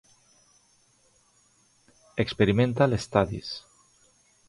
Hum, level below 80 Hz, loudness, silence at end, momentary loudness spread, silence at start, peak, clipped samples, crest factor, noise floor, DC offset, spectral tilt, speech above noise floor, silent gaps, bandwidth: none; -52 dBFS; -26 LUFS; 0.9 s; 15 LU; 2.15 s; -6 dBFS; under 0.1%; 22 dB; -64 dBFS; under 0.1%; -6.5 dB/octave; 40 dB; none; 11.5 kHz